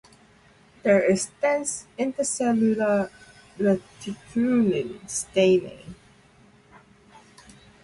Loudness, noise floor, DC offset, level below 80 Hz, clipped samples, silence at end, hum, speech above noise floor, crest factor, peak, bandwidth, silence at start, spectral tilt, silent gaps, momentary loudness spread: -24 LUFS; -56 dBFS; under 0.1%; -62 dBFS; under 0.1%; 1.9 s; none; 32 dB; 18 dB; -8 dBFS; 11.5 kHz; 0.85 s; -5 dB/octave; none; 13 LU